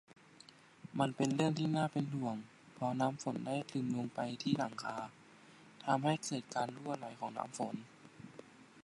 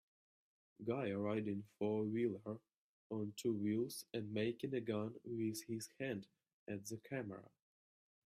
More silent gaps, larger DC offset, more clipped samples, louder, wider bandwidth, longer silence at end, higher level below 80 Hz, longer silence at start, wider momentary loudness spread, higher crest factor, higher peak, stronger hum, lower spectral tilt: second, none vs 2.76-3.10 s, 6.53-6.66 s; neither; neither; first, -38 LUFS vs -43 LUFS; second, 11.5 kHz vs 15 kHz; second, 0.05 s vs 0.85 s; about the same, -80 dBFS vs -82 dBFS; about the same, 0.85 s vs 0.8 s; first, 23 LU vs 10 LU; about the same, 20 dB vs 16 dB; first, -18 dBFS vs -28 dBFS; neither; about the same, -5.5 dB/octave vs -6 dB/octave